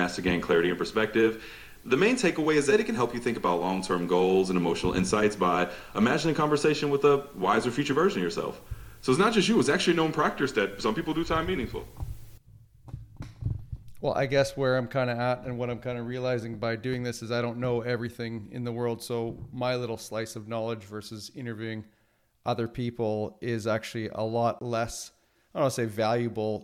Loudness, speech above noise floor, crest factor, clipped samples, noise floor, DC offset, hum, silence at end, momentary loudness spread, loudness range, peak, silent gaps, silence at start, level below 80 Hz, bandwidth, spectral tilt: -28 LUFS; 37 dB; 18 dB; under 0.1%; -64 dBFS; under 0.1%; none; 0 s; 14 LU; 8 LU; -10 dBFS; none; 0 s; -50 dBFS; 18 kHz; -5.5 dB/octave